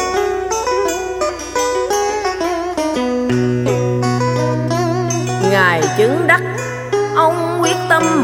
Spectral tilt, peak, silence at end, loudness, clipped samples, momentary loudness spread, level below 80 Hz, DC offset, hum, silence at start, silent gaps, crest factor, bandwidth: -5 dB/octave; 0 dBFS; 0 s; -16 LUFS; under 0.1%; 6 LU; -44 dBFS; under 0.1%; none; 0 s; none; 16 dB; 17 kHz